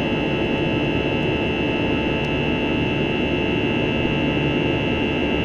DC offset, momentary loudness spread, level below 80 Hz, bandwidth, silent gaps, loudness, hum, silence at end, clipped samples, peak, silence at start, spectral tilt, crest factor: under 0.1%; 1 LU; -36 dBFS; 7.8 kHz; none; -21 LUFS; none; 0 s; under 0.1%; -8 dBFS; 0 s; -7 dB/octave; 12 dB